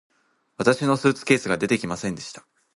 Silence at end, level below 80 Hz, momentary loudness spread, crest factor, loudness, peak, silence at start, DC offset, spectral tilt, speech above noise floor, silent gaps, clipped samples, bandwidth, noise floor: 0.4 s; -58 dBFS; 11 LU; 20 dB; -22 LUFS; -4 dBFS; 0.6 s; under 0.1%; -5 dB/octave; 26 dB; none; under 0.1%; 11.5 kHz; -48 dBFS